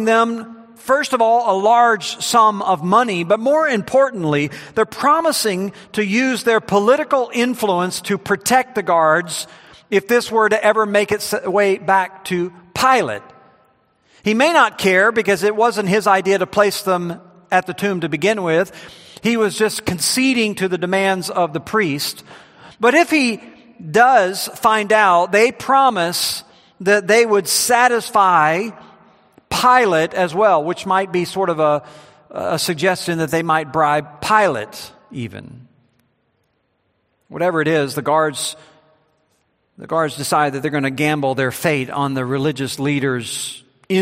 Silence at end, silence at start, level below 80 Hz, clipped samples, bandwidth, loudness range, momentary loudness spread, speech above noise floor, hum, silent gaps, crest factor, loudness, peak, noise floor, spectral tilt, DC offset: 0 s; 0 s; -58 dBFS; under 0.1%; 16 kHz; 6 LU; 11 LU; 49 dB; none; none; 18 dB; -16 LUFS; 0 dBFS; -66 dBFS; -4 dB/octave; under 0.1%